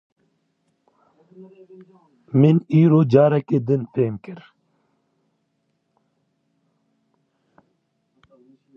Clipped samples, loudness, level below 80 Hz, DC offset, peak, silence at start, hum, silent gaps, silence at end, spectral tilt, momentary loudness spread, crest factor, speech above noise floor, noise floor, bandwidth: under 0.1%; -18 LUFS; -68 dBFS; under 0.1%; -2 dBFS; 1.4 s; none; none; 4.4 s; -10.5 dB/octave; 18 LU; 22 dB; 53 dB; -71 dBFS; 5.8 kHz